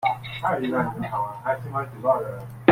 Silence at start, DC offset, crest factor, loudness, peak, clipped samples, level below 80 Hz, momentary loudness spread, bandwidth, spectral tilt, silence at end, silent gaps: 0 s; under 0.1%; 22 dB; -26 LUFS; -2 dBFS; under 0.1%; -56 dBFS; 5 LU; 16.5 kHz; -7.5 dB/octave; 0 s; none